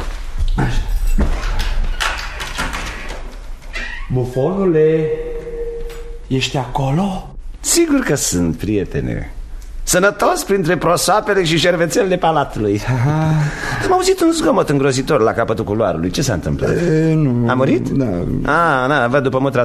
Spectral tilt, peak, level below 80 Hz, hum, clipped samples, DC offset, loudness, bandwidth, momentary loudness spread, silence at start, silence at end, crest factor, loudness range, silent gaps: -5 dB/octave; -2 dBFS; -26 dBFS; none; under 0.1%; under 0.1%; -17 LUFS; 13.5 kHz; 13 LU; 0 s; 0 s; 14 dB; 7 LU; none